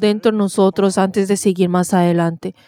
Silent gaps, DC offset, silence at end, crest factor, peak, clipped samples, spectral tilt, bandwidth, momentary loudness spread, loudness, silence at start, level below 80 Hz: none; under 0.1%; 0.15 s; 14 dB; -2 dBFS; under 0.1%; -6 dB/octave; 15.5 kHz; 2 LU; -16 LUFS; 0 s; -62 dBFS